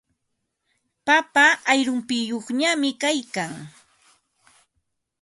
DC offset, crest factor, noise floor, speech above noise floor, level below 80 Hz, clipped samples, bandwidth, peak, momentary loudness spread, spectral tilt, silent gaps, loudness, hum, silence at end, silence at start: under 0.1%; 20 dB; -77 dBFS; 56 dB; -74 dBFS; under 0.1%; 11.5 kHz; -4 dBFS; 14 LU; -2.5 dB/octave; none; -21 LUFS; none; 1.5 s; 1.05 s